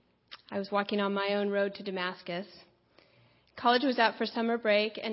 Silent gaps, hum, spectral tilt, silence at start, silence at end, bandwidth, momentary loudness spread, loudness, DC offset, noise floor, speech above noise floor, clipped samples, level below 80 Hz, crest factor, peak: none; none; -8.5 dB/octave; 0.3 s; 0 s; 5.8 kHz; 12 LU; -30 LUFS; under 0.1%; -64 dBFS; 35 dB; under 0.1%; -78 dBFS; 20 dB; -10 dBFS